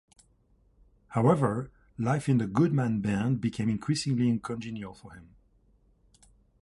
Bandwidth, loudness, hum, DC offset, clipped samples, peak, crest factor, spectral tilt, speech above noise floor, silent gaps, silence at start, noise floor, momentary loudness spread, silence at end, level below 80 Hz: 11.5 kHz; -28 LUFS; none; under 0.1%; under 0.1%; -10 dBFS; 20 dB; -7 dB/octave; 38 dB; none; 1.1 s; -65 dBFS; 14 LU; 1.4 s; -58 dBFS